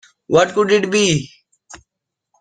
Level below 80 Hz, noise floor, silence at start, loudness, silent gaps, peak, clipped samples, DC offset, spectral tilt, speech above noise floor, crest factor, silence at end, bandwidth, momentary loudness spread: -54 dBFS; -81 dBFS; 0.3 s; -16 LUFS; none; -2 dBFS; under 0.1%; under 0.1%; -4 dB/octave; 66 dB; 18 dB; 0.65 s; 9.6 kHz; 7 LU